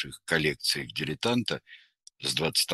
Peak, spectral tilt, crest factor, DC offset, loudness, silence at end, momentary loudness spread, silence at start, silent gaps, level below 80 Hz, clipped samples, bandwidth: -10 dBFS; -3 dB/octave; 20 dB; under 0.1%; -28 LUFS; 0 s; 8 LU; 0 s; none; -60 dBFS; under 0.1%; 13 kHz